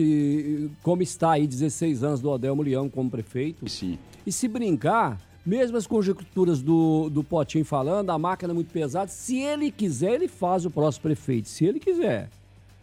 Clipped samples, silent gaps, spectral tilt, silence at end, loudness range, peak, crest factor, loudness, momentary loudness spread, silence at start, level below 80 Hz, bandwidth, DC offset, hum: under 0.1%; none; -6.5 dB/octave; 0.55 s; 3 LU; -8 dBFS; 16 dB; -25 LUFS; 7 LU; 0 s; -56 dBFS; 14.5 kHz; under 0.1%; none